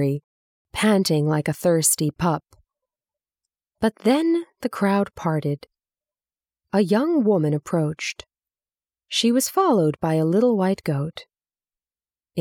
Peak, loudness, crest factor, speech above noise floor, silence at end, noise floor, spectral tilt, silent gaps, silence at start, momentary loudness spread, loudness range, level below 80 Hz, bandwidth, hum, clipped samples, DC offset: -6 dBFS; -21 LUFS; 18 dB; over 69 dB; 0 s; under -90 dBFS; -5 dB/octave; 0.24-0.65 s; 0 s; 11 LU; 3 LU; -58 dBFS; 17.5 kHz; none; under 0.1%; under 0.1%